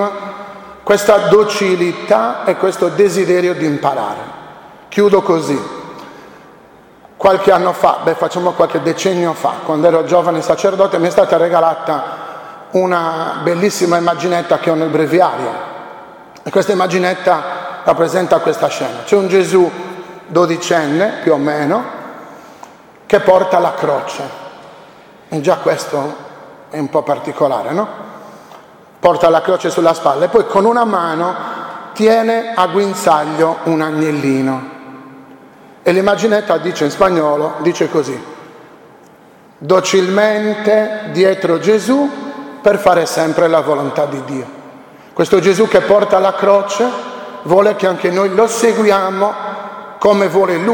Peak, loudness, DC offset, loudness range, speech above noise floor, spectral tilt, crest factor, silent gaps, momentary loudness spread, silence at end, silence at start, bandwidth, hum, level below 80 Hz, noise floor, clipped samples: 0 dBFS; -14 LUFS; under 0.1%; 4 LU; 30 dB; -5 dB/octave; 14 dB; none; 16 LU; 0 s; 0 s; 17.5 kHz; none; -54 dBFS; -43 dBFS; under 0.1%